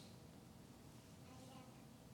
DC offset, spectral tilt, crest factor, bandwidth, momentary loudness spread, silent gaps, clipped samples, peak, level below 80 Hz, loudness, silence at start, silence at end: under 0.1%; -5 dB/octave; 12 dB; 18 kHz; 3 LU; none; under 0.1%; -48 dBFS; -76 dBFS; -61 LUFS; 0 s; 0 s